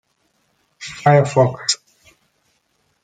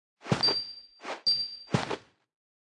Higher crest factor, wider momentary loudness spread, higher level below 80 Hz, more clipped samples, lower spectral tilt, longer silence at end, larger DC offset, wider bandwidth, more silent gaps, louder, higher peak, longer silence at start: about the same, 20 dB vs 22 dB; first, 18 LU vs 15 LU; about the same, -62 dBFS vs -66 dBFS; neither; about the same, -5 dB/octave vs -4.5 dB/octave; first, 1.3 s vs 0.8 s; neither; second, 9.4 kHz vs 11.5 kHz; neither; first, -17 LUFS vs -28 LUFS; first, -2 dBFS vs -10 dBFS; first, 0.8 s vs 0.25 s